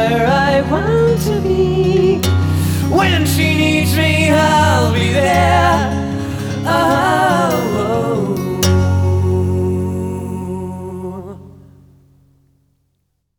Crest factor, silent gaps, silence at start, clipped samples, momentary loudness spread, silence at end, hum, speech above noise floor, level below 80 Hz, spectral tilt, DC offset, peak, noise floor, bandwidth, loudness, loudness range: 14 dB; none; 0 s; under 0.1%; 11 LU; 1.9 s; none; 54 dB; -34 dBFS; -5.5 dB/octave; under 0.1%; -2 dBFS; -67 dBFS; over 20 kHz; -14 LUFS; 9 LU